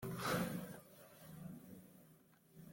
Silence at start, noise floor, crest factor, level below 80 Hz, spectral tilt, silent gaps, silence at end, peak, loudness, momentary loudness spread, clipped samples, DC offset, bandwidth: 0 s; -68 dBFS; 20 dB; -72 dBFS; -5 dB/octave; none; 0 s; -28 dBFS; -45 LUFS; 24 LU; under 0.1%; under 0.1%; 17 kHz